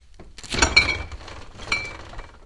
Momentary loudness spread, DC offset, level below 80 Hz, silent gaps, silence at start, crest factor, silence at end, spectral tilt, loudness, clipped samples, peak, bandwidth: 24 LU; under 0.1%; -36 dBFS; none; 0.05 s; 24 dB; 0 s; -2 dB/octave; -21 LUFS; under 0.1%; 0 dBFS; 11.5 kHz